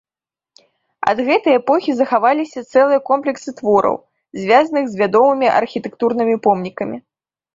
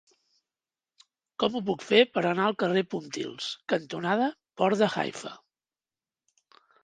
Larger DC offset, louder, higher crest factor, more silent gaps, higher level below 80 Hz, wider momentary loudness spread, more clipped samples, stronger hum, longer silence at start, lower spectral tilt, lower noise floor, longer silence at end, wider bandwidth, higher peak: neither; first, -16 LUFS vs -27 LUFS; second, 16 dB vs 24 dB; neither; first, -62 dBFS vs -74 dBFS; about the same, 11 LU vs 12 LU; neither; neither; second, 1 s vs 1.4 s; about the same, -6 dB/octave vs -5 dB/octave; about the same, under -90 dBFS vs under -90 dBFS; second, 0.55 s vs 1.45 s; second, 7.6 kHz vs 9.6 kHz; first, -2 dBFS vs -6 dBFS